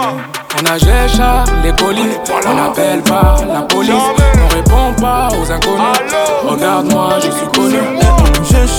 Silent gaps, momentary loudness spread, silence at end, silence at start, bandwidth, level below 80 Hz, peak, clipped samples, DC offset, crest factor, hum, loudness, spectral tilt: none; 4 LU; 0 s; 0 s; over 20 kHz; -14 dBFS; 0 dBFS; under 0.1%; under 0.1%; 10 dB; none; -11 LUFS; -5 dB/octave